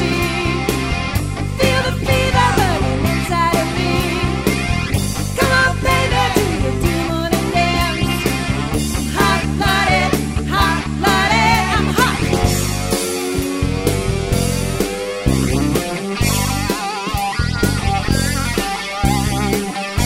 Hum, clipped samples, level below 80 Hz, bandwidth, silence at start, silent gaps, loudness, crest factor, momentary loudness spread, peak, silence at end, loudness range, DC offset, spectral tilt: none; under 0.1%; -26 dBFS; 16.5 kHz; 0 s; none; -17 LUFS; 16 dB; 6 LU; 0 dBFS; 0 s; 3 LU; under 0.1%; -4.5 dB/octave